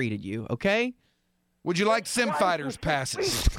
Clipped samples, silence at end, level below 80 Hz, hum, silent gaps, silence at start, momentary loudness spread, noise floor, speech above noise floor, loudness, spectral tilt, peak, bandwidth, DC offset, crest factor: under 0.1%; 0 s; -38 dBFS; none; none; 0 s; 8 LU; -73 dBFS; 46 dB; -26 LUFS; -4 dB/octave; -12 dBFS; 17.5 kHz; under 0.1%; 16 dB